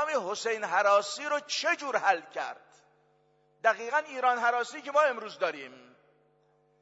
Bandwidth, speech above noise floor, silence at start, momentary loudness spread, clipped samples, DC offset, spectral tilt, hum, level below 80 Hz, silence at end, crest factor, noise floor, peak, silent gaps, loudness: 8 kHz; 39 dB; 0 s; 12 LU; under 0.1%; under 0.1%; -1 dB/octave; none; -90 dBFS; 1 s; 20 dB; -68 dBFS; -10 dBFS; none; -29 LUFS